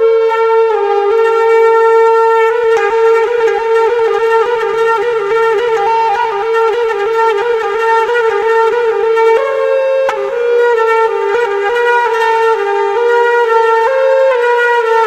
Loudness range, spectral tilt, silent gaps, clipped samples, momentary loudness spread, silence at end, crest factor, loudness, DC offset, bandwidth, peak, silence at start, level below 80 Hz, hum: 2 LU; -2.5 dB/octave; none; under 0.1%; 4 LU; 0 s; 10 dB; -11 LUFS; under 0.1%; 8.8 kHz; 0 dBFS; 0 s; -54 dBFS; none